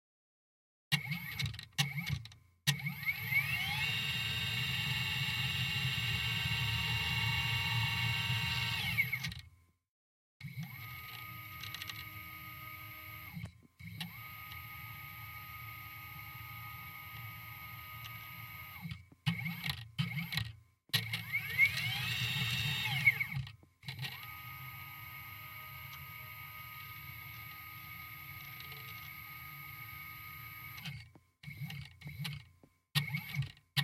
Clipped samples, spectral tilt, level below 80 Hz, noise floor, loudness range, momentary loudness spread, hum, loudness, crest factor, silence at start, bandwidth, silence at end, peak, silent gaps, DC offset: under 0.1%; -3 dB/octave; -62 dBFS; -66 dBFS; 14 LU; 14 LU; none; -37 LUFS; 24 dB; 0.9 s; 16.5 kHz; 0 s; -14 dBFS; 9.89-10.40 s; under 0.1%